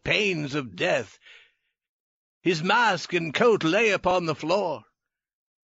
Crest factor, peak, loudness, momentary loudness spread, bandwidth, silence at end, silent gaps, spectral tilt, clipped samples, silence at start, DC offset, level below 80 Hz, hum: 18 dB; -8 dBFS; -24 LUFS; 9 LU; 8 kHz; 0.9 s; 1.89-2.41 s; -3 dB/octave; under 0.1%; 0.05 s; under 0.1%; -58 dBFS; none